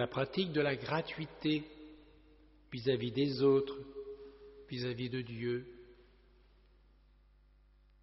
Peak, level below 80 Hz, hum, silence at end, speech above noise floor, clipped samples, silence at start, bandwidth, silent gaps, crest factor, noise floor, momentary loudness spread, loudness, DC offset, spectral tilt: -18 dBFS; -64 dBFS; 50 Hz at -65 dBFS; 2.1 s; 30 dB; under 0.1%; 0 s; 5.8 kHz; none; 20 dB; -65 dBFS; 23 LU; -36 LUFS; under 0.1%; -5 dB/octave